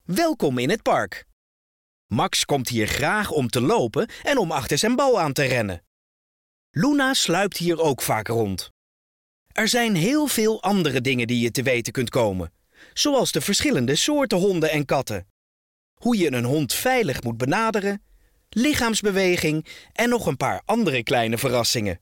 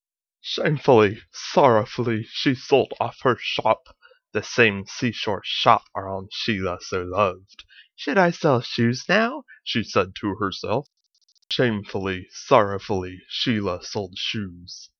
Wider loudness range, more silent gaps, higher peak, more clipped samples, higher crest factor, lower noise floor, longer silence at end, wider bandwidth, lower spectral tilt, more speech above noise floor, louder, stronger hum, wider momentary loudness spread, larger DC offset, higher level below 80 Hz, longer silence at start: about the same, 2 LU vs 4 LU; first, 1.33-2.09 s, 5.87-6.74 s, 8.70-9.46 s, 15.30-15.97 s vs none; second, -10 dBFS vs 0 dBFS; neither; second, 12 dB vs 22 dB; first, under -90 dBFS vs -65 dBFS; about the same, 0.05 s vs 0.15 s; first, 17 kHz vs 7 kHz; about the same, -4 dB/octave vs -5 dB/octave; first, over 68 dB vs 42 dB; about the same, -22 LUFS vs -23 LUFS; neither; second, 8 LU vs 12 LU; neither; first, -50 dBFS vs -60 dBFS; second, 0.1 s vs 0.45 s